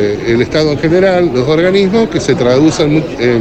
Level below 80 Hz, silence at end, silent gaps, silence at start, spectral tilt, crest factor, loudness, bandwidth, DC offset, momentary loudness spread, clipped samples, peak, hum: -36 dBFS; 0 s; none; 0 s; -6 dB/octave; 10 dB; -11 LUFS; 8.8 kHz; under 0.1%; 3 LU; under 0.1%; 0 dBFS; none